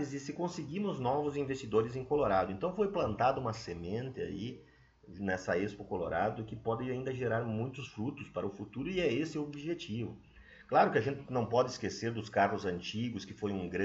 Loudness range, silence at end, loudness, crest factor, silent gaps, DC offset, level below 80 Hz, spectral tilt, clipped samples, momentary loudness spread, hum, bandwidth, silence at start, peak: 4 LU; 0 s; -35 LUFS; 20 dB; none; under 0.1%; -62 dBFS; -6 dB/octave; under 0.1%; 9 LU; none; 8 kHz; 0 s; -14 dBFS